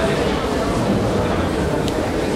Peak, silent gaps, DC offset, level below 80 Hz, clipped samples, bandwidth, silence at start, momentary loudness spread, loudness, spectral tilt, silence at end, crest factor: -4 dBFS; none; under 0.1%; -32 dBFS; under 0.1%; 16 kHz; 0 s; 2 LU; -20 LUFS; -6 dB/octave; 0 s; 16 dB